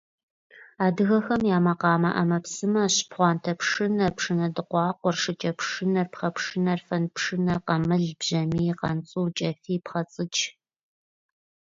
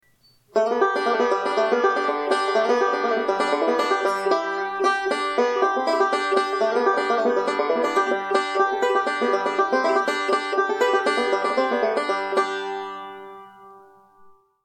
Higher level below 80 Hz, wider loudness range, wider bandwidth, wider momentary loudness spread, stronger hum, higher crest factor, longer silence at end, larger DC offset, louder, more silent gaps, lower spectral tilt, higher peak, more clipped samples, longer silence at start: first, -60 dBFS vs -76 dBFS; about the same, 4 LU vs 2 LU; second, 7.8 kHz vs 12.5 kHz; first, 7 LU vs 3 LU; neither; about the same, 18 dB vs 14 dB; first, 1.2 s vs 0.85 s; neither; second, -25 LUFS vs -22 LUFS; neither; first, -5 dB/octave vs -3 dB/octave; about the same, -8 dBFS vs -8 dBFS; neither; about the same, 0.55 s vs 0.55 s